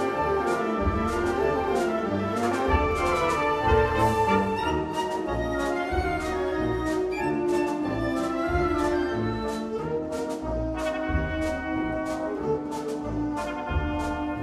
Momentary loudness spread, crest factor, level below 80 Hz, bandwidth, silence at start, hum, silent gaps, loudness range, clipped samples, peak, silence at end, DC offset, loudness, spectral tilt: 7 LU; 16 dB; -38 dBFS; 14 kHz; 0 s; none; none; 5 LU; under 0.1%; -10 dBFS; 0 s; under 0.1%; -26 LUFS; -6.5 dB/octave